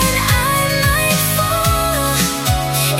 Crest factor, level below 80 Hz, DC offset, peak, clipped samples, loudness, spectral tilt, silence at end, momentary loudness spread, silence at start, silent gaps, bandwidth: 14 dB; -28 dBFS; under 0.1%; -2 dBFS; under 0.1%; -15 LUFS; -3.5 dB/octave; 0 s; 2 LU; 0 s; none; 16.5 kHz